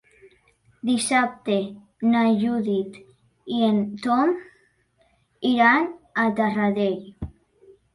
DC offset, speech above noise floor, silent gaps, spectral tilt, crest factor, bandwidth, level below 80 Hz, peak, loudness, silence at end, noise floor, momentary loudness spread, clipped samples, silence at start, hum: under 0.1%; 43 dB; none; -5 dB/octave; 18 dB; 11.5 kHz; -54 dBFS; -6 dBFS; -22 LUFS; 0.7 s; -64 dBFS; 14 LU; under 0.1%; 0.85 s; none